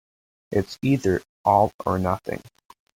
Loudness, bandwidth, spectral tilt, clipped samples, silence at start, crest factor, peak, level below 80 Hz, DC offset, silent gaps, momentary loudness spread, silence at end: -23 LUFS; 17 kHz; -7.5 dB/octave; under 0.1%; 0.5 s; 18 dB; -6 dBFS; -54 dBFS; under 0.1%; 1.29-1.44 s, 1.74-1.79 s; 9 LU; 0.55 s